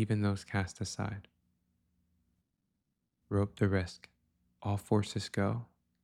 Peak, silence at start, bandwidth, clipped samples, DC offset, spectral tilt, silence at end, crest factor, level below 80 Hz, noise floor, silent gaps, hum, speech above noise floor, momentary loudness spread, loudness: -16 dBFS; 0 s; 13 kHz; under 0.1%; under 0.1%; -6.5 dB/octave; 0.4 s; 20 dB; -62 dBFS; -83 dBFS; none; none; 50 dB; 11 LU; -35 LUFS